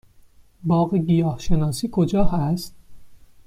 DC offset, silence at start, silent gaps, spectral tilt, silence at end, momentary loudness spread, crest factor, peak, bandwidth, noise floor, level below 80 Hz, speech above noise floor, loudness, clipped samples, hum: under 0.1%; 0.65 s; none; -7.5 dB/octave; 0.3 s; 8 LU; 16 dB; -4 dBFS; 15 kHz; -51 dBFS; -34 dBFS; 32 dB; -22 LUFS; under 0.1%; none